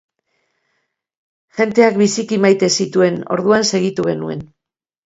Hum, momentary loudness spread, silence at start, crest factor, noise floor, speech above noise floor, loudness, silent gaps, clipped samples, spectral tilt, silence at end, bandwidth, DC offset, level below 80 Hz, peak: none; 10 LU; 1.55 s; 16 dB; -84 dBFS; 69 dB; -15 LUFS; none; under 0.1%; -4.5 dB/octave; 0.6 s; 8 kHz; under 0.1%; -58 dBFS; 0 dBFS